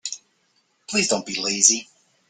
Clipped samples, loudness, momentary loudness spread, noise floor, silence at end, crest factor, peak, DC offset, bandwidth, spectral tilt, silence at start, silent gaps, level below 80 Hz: under 0.1%; -19 LUFS; 14 LU; -66 dBFS; 0.45 s; 24 dB; -2 dBFS; under 0.1%; 11 kHz; -1 dB/octave; 0.05 s; none; -68 dBFS